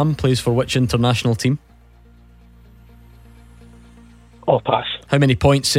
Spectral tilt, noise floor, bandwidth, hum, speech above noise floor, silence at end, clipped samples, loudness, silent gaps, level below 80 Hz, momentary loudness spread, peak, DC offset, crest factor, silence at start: -5.5 dB/octave; -48 dBFS; 16 kHz; none; 31 dB; 0 s; under 0.1%; -18 LUFS; none; -40 dBFS; 6 LU; -2 dBFS; under 0.1%; 18 dB; 0 s